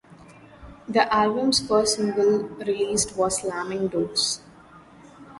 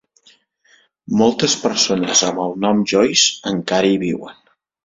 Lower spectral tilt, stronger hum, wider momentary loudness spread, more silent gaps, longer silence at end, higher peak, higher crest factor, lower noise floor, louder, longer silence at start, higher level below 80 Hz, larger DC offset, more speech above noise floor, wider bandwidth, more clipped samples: about the same, -3 dB/octave vs -3 dB/octave; neither; about the same, 7 LU vs 8 LU; neither; second, 0 s vs 0.5 s; second, -4 dBFS vs 0 dBFS; about the same, 20 dB vs 18 dB; second, -49 dBFS vs -56 dBFS; second, -23 LUFS vs -16 LUFS; second, 0.1 s vs 1.1 s; about the same, -54 dBFS vs -56 dBFS; neither; second, 26 dB vs 39 dB; first, 11.5 kHz vs 7.8 kHz; neither